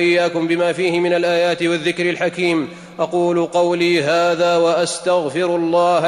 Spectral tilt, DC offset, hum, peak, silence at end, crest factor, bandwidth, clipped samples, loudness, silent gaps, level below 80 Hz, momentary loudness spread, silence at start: -4.5 dB/octave; under 0.1%; none; -6 dBFS; 0 s; 10 dB; 11 kHz; under 0.1%; -17 LUFS; none; -62 dBFS; 4 LU; 0 s